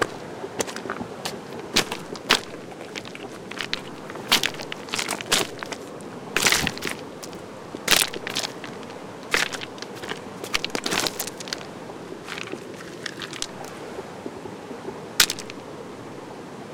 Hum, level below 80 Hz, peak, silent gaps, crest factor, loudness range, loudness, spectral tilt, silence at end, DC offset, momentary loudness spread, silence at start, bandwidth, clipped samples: none; -56 dBFS; 0 dBFS; none; 28 dB; 6 LU; -26 LUFS; -1.5 dB/octave; 0 s; under 0.1%; 17 LU; 0 s; 18 kHz; under 0.1%